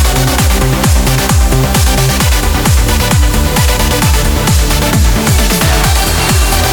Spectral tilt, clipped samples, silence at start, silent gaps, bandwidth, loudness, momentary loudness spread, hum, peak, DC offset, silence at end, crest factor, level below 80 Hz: -4 dB/octave; under 0.1%; 0 s; none; over 20 kHz; -10 LUFS; 1 LU; none; 0 dBFS; under 0.1%; 0 s; 8 dB; -12 dBFS